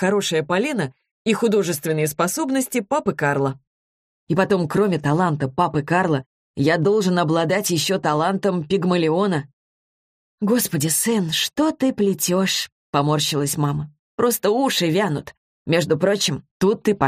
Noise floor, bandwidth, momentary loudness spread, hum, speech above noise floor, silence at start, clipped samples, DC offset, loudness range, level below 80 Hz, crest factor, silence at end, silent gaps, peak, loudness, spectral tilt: under -90 dBFS; 15.5 kHz; 5 LU; none; over 70 dB; 0 s; under 0.1%; under 0.1%; 2 LU; -58 dBFS; 16 dB; 0 s; 1.11-1.25 s, 3.67-4.27 s, 6.26-6.54 s, 9.53-10.38 s, 12.72-12.93 s, 13.99-14.18 s, 15.37-15.65 s, 16.51-16.60 s; -4 dBFS; -20 LUFS; -4.5 dB/octave